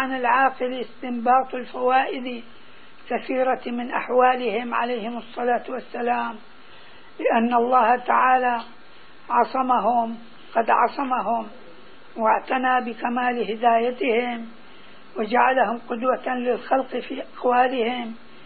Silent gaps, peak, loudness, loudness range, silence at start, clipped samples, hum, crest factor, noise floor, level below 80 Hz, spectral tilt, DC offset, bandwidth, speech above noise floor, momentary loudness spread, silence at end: none; -4 dBFS; -22 LUFS; 3 LU; 0 s; under 0.1%; none; 18 dB; -49 dBFS; -66 dBFS; -9 dB/octave; 0.9%; 4.7 kHz; 27 dB; 12 LU; 0.3 s